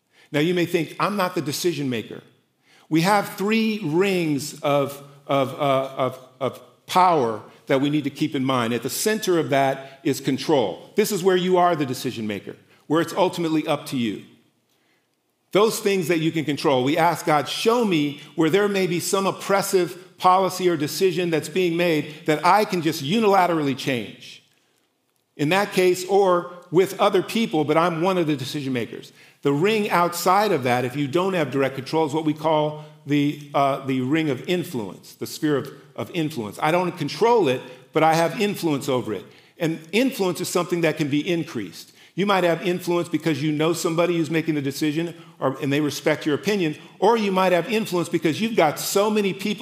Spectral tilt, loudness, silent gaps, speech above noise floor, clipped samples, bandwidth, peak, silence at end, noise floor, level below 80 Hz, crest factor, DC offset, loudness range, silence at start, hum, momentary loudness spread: -5 dB/octave; -22 LUFS; none; 48 dB; under 0.1%; 16 kHz; -2 dBFS; 0 s; -70 dBFS; -78 dBFS; 20 dB; under 0.1%; 3 LU; 0.3 s; none; 9 LU